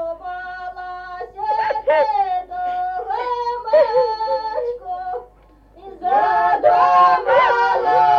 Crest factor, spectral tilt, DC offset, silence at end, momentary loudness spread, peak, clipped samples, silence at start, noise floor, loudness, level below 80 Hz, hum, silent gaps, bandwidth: 14 dB; -4.5 dB/octave; under 0.1%; 0 s; 17 LU; -4 dBFS; under 0.1%; 0 s; -49 dBFS; -18 LUFS; -52 dBFS; 50 Hz at -50 dBFS; none; 7 kHz